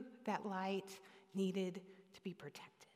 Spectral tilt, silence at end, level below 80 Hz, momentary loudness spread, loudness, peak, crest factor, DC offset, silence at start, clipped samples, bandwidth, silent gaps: -6 dB/octave; 0.1 s; under -90 dBFS; 16 LU; -45 LUFS; -26 dBFS; 20 dB; under 0.1%; 0 s; under 0.1%; 15.5 kHz; none